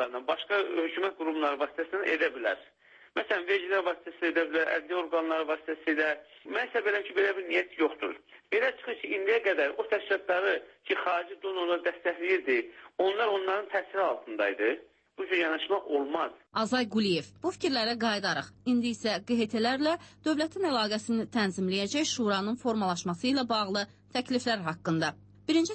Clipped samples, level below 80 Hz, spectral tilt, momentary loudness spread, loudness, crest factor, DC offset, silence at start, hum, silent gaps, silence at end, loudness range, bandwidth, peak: under 0.1%; -72 dBFS; -4 dB/octave; 5 LU; -30 LUFS; 16 dB; under 0.1%; 0 s; none; none; 0 s; 1 LU; 8.8 kHz; -14 dBFS